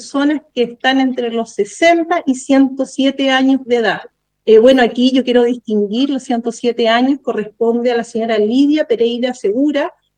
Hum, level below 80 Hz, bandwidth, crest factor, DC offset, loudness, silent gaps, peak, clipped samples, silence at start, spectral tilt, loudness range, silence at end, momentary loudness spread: none; -58 dBFS; 9.6 kHz; 14 dB; under 0.1%; -14 LUFS; none; 0 dBFS; under 0.1%; 0 s; -4.5 dB/octave; 3 LU; 0.3 s; 8 LU